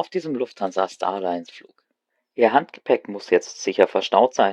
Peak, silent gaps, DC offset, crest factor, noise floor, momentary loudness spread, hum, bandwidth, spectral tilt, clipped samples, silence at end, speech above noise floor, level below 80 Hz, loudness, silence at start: 0 dBFS; none; under 0.1%; 22 dB; -76 dBFS; 9 LU; none; 9.4 kHz; -4 dB/octave; under 0.1%; 0 s; 55 dB; -72 dBFS; -22 LUFS; 0 s